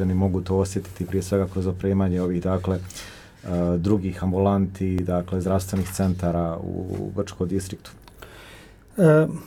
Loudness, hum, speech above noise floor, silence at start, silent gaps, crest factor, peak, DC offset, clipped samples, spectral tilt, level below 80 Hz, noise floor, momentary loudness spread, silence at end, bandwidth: -24 LUFS; none; 23 dB; 0 s; none; 18 dB; -4 dBFS; under 0.1%; under 0.1%; -7.5 dB/octave; -46 dBFS; -46 dBFS; 15 LU; 0 s; 16 kHz